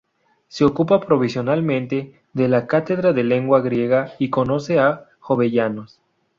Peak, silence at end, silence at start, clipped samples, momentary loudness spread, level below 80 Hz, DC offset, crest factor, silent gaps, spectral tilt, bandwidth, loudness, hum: -2 dBFS; 0.5 s; 0.55 s; under 0.1%; 9 LU; -56 dBFS; under 0.1%; 16 dB; none; -8 dB/octave; 7.6 kHz; -19 LUFS; none